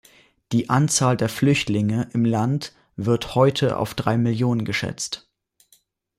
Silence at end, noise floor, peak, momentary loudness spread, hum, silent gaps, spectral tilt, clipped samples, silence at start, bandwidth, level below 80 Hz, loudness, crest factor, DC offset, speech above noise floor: 1 s; -61 dBFS; -6 dBFS; 9 LU; none; none; -5.5 dB/octave; under 0.1%; 0.5 s; 15.5 kHz; -54 dBFS; -22 LUFS; 18 dB; under 0.1%; 40 dB